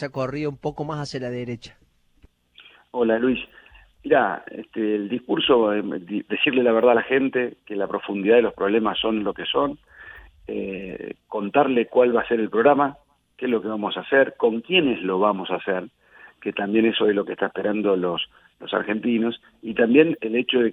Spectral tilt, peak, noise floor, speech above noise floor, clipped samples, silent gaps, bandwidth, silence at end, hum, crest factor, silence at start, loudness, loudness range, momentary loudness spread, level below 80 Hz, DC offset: -6.5 dB/octave; -2 dBFS; -57 dBFS; 35 dB; under 0.1%; none; 7.4 kHz; 0 s; none; 22 dB; 0 s; -22 LUFS; 5 LU; 15 LU; -58 dBFS; under 0.1%